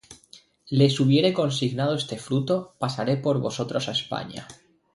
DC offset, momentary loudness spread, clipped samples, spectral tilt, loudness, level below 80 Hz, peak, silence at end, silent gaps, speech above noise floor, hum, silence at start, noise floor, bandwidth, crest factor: under 0.1%; 11 LU; under 0.1%; -6 dB/octave; -24 LUFS; -62 dBFS; -8 dBFS; 0.4 s; none; 30 dB; none; 0.1 s; -54 dBFS; 11.5 kHz; 18 dB